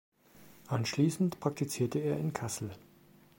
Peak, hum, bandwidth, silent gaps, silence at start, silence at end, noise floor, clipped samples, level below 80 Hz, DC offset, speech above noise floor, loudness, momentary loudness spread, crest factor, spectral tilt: -14 dBFS; none; 16.5 kHz; none; 0.35 s; 0.6 s; -61 dBFS; under 0.1%; -70 dBFS; under 0.1%; 28 dB; -33 LUFS; 9 LU; 20 dB; -6 dB/octave